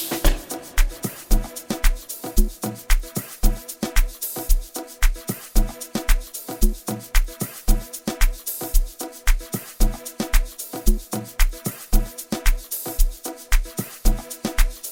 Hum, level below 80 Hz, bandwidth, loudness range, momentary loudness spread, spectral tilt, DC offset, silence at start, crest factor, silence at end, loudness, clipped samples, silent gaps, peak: none; -22 dBFS; 17 kHz; 1 LU; 5 LU; -4 dB/octave; under 0.1%; 0 s; 18 dB; 0 s; -26 LUFS; under 0.1%; none; -2 dBFS